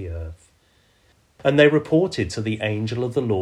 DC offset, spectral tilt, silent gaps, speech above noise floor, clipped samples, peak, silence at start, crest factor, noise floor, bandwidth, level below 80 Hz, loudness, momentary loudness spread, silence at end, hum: under 0.1%; -6.5 dB/octave; none; 39 dB; under 0.1%; -2 dBFS; 0 s; 20 dB; -60 dBFS; 11 kHz; -46 dBFS; -21 LUFS; 15 LU; 0 s; none